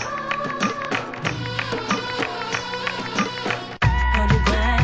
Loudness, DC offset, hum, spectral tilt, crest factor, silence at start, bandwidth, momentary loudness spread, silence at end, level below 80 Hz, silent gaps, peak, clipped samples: -23 LUFS; 0.2%; none; -5 dB/octave; 20 dB; 0 s; 8.2 kHz; 7 LU; 0 s; -28 dBFS; none; -2 dBFS; under 0.1%